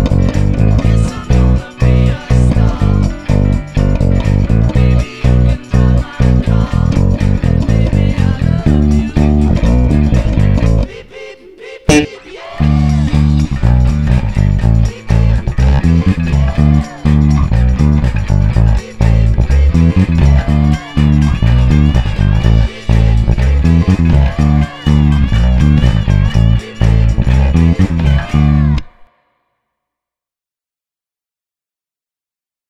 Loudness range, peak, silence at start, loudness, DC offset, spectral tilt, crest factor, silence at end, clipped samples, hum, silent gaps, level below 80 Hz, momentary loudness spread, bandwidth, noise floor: 3 LU; 0 dBFS; 0 s; -12 LUFS; 0.5%; -7.5 dB/octave; 10 dB; 3.65 s; under 0.1%; none; none; -14 dBFS; 3 LU; 9.8 kHz; -90 dBFS